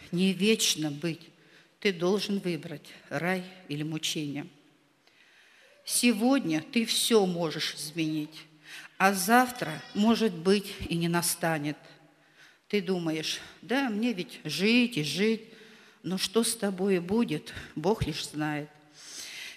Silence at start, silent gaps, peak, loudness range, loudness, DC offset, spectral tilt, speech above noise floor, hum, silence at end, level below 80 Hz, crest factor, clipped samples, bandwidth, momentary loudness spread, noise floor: 0 s; none; -6 dBFS; 5 LU; -28 LUFS; under 0.1%; -4 dB/octave; 35 dB; none; 0 s; -60 dBFS; 22 dB; under 0.1%; 15.5 kHz; 16 LU; -64 dBFS